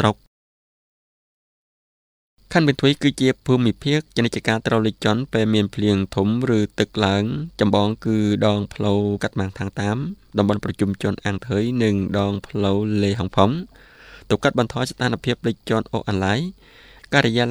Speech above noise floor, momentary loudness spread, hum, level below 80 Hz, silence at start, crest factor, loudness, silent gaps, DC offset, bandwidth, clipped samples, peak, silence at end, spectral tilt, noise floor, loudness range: over 70 dB; 6 LU; none; -50 dBFS; 0 s; 20 dB; -21 LUFS; 0.27-2.37 s; under 0.1%; 13 kHz; under 0.1%; 0 dBFS; 0 s; -6.5 dB/octave; under -90 dBFS; 3 LU